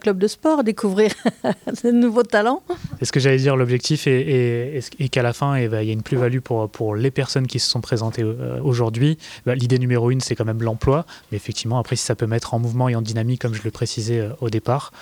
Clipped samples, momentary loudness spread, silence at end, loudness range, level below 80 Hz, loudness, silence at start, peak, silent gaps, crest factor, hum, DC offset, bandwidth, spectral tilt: under 0.1%; 7 LU; 0 s; 3 LU; -48 dBFS; -21 LUFS; 0.05 s; -4 dBFS; none; 16 dB; none; under 0.1%; 14 kHz; -6 dB/octave